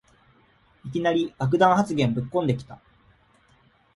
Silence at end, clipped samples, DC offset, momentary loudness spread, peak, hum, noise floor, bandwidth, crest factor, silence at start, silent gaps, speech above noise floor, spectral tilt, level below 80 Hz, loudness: 1.2 s; under 0.1%; under 0.1%; 14 LU; -4 dBFS; none; -60 dBFS; 11.5 kHz; 22 dB; 0.85 s; none; 38 dB; -7 dB/octave; -58 dBFS; -23 LUFS